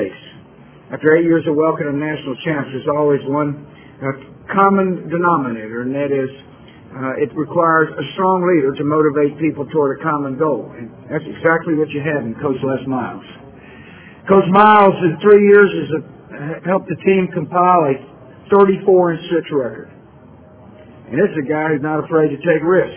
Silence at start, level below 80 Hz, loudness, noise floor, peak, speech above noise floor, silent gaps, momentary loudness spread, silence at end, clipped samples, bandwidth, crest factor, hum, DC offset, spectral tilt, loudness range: 0 s; -54 dBFS; -16 LUFS; -42 dBFS; 0 dBFS; 27 dB; none; 15 LU; 0 s; under 0.1%; 4 kHz; 16 dB; none; under 0.1%; -11 dB/octave; 7 LU